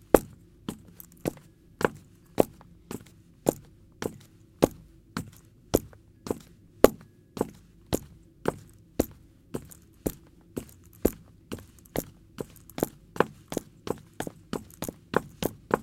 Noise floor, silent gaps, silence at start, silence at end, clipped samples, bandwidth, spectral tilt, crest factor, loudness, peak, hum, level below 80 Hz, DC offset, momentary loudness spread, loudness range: -53 dBFS; none; 0.15 s; 0 s; under 0.1%; 17 kHz; -5.5 dB/octave; 32 dB; -32 LUFS; 0 dBFS; none; -50 dBFS; under 0.1%; 19 LU; 6 LU